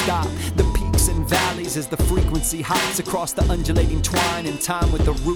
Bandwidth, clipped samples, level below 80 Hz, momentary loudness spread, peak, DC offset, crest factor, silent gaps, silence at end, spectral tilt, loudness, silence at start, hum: over 20 kHz; under 0.1%; -24 dBFS; 4 LU; -4 dBFS; under 0.1%; 16 dB; none; 0 s; -4.5 dB/octave; -21 LUFS; 0 s; none